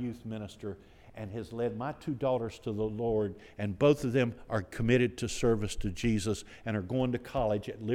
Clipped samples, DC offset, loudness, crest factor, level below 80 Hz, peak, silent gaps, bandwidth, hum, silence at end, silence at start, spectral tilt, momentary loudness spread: under 0.1%; under 0.1%; -32 LUFS; 20 dB; -50 dBFS; -12 dBFS; none; 15.5 kHz; none; 0 s; 0 s; -6 dB/octave; 14 LU